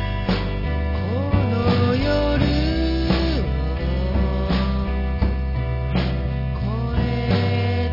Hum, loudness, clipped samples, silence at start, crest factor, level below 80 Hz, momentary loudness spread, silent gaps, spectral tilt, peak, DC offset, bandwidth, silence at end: none; -22 LUFS; under 0.1%; 0 s; 16 dB; -26 dBFS; 5 LU; none; -8.5 dB/octave; -4 dBFS; under 0.1%; 5.8 kHz; 0 s